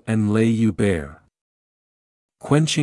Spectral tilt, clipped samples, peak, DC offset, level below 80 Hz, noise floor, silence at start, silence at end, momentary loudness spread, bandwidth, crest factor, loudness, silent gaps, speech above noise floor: -6 dB/octave; under 0.1%; -4 dBFS; under 0.1%; -50 dBFS; under -90 dBFS; 0.05 s; 0 s; 16 LU; 12 kHz; 18 dB; -20 LUFS; 1.41-2.29 s; over 71 dB